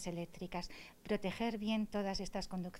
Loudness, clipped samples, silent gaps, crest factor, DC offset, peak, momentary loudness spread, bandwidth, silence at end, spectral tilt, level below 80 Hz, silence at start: -40 LUFS; under 0.1%; none; 16 dB; under 0.1%; -24 dBFS; 8 LU; 16 kHz; 0 s; -5.5 dB/octave; -56 dBFS; 0 s